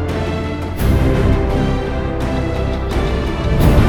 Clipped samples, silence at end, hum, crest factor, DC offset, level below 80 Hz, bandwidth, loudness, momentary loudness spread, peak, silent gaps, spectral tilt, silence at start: under 0.1%; 0 s; none; 16 dB; under 0.1%; -20 dBFS; over 20 kHz; -18 LUFS; 6 LU; 0 dBFS; none; -7.5 dB/octave; 0 s